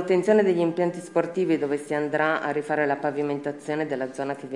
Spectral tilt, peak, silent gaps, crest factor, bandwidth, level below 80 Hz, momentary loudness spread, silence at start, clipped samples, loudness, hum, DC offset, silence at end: -6.5 dB/octave; -6 dBFS; none; 18 dB; 11.5 kHz; -78 dBFS; 9 LU; 0 s; under 0.1%; -25 LUFS; none; under 0.1%; 0 s